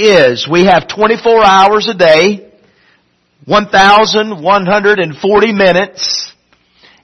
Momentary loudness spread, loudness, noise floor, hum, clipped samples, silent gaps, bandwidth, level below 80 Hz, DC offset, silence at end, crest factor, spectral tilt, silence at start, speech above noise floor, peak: 8 LU; -9 LUFS; -54 dBFS; none; 0.3%; none; 11 kHz; -44 dBFS; under 0.1%; 0.75 s; 10 dB; -4 dB/octave; 0 s; 46 dB; 0 dBFS